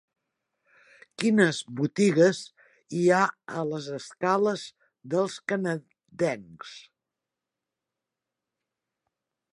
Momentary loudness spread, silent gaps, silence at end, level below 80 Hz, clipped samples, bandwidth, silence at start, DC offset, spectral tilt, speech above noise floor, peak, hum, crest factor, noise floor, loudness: 15 LU; none; 2.75 s; -76 dBFS; under 0.1%; 11 kHz; 1.2 s; under 0.1%; -5.5 dB/octave; 62 dB; -8 dBFS; none; 20 dB; -88 dBFS; -26 LUFS